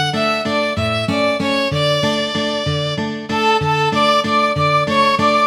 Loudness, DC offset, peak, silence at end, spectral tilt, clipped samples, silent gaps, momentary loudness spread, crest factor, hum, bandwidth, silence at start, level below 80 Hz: -16 LUFS; under 0.1%; -2 dBFS; 0 s; -5 dB/octave; under 0.1%; none; 5 LU; 14 dB; none; 17.5 kHz; 0 s; -46 dBFS